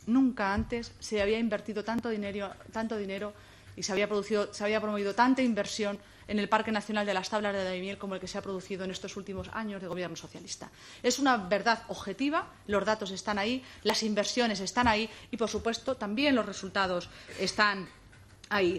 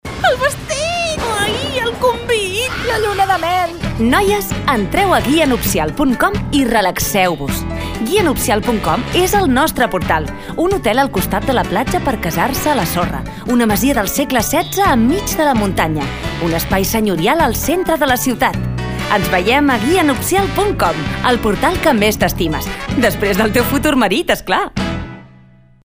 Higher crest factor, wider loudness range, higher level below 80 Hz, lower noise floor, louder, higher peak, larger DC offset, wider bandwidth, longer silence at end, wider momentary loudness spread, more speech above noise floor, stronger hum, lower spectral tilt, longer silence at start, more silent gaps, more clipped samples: first, 22 dB vs 14 dB; about the same, 4 LU vs 2 LU; second, -56 dBFS vs -30 dBFS; first, -54 dBFS vs -44 dBFS; second, -31 LUFS vs -15 LUFS; second, -10 dBFS vs 0 dBFS; neither; second, 14.5 kHz vs 16 kHz; second, 0 s vs 0.65 s; first, 11 LU vs 6 LU; second, 23 dB vs 30 dB; neither; about the same, -4 dB/octave vs -4.5 dB/octave; about the same, 0 s vs 0.05 s; neither; neither